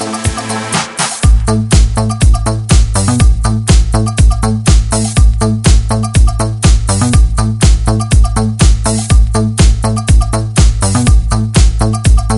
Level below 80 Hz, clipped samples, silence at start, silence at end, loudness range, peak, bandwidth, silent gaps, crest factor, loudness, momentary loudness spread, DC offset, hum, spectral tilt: -12 dBFS; 0.1%; 0 s; 0 s; 0 LU; 0 dBFS; 11.5 kHz; none; 8 dB; -11 LUFS; 3 LU; under 0.1%; none; -5 dB/octave